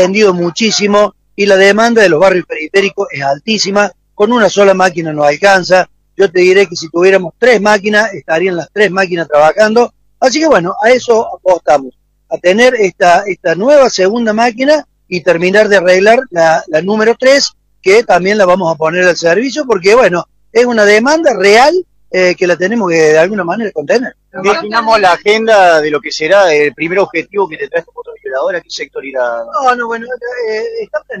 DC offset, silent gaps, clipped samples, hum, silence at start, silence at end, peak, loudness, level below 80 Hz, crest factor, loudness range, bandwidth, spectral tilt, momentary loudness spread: under 0.1%; none; 0.3%; none; 0 s; 0 s; 0 dBFS; -10 LUFS; -50 dBFS; 10 dB; 3 LU; 12.5 kHz; -4 dB/octave; 10 LU